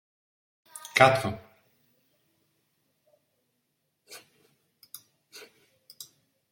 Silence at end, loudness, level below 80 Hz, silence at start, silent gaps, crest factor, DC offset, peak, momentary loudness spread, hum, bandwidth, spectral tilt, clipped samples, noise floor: 0.5 s; -23 LUFS; -70 dBFS; 0.75 s; none; 30 dB; under 0.1%; -2 dBFS; 28 LU; none; 17 kHz; -4 dB/octave; under 0.1%; -78 dBFS